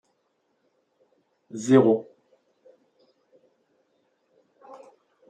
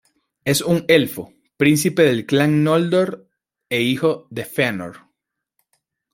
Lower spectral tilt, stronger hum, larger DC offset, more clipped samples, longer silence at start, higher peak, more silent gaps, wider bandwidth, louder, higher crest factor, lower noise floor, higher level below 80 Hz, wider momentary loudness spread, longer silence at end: first, -7 dB/octave vs -5 dB/octave; neither; neither; neither; first, 1.55 s vs 0.45 s; second, -6 dBFS vs -2 dBFS; neither; second, 9.4 kHz vs 16.5 kHz; second, -21 LUFS vs -18 LUFS; first, 24 dB vs 18 dB; second, -73 dBFS vs -78 dBFS; second, -78 dBFS vs -58 dBFS; first, 30 LU vs 13 LU; second, 0.55 s vs 1.15 s